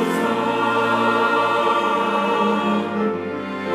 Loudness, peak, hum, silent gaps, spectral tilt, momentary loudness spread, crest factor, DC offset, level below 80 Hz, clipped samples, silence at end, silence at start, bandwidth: -19 LUFS; -6 dBFS; none; none; -5.5 dB/octave; 6 LU; 14 dB; under 0.1%; -64 dBFS; under 0.1%; 0 s; 0 s; 15.5 kHz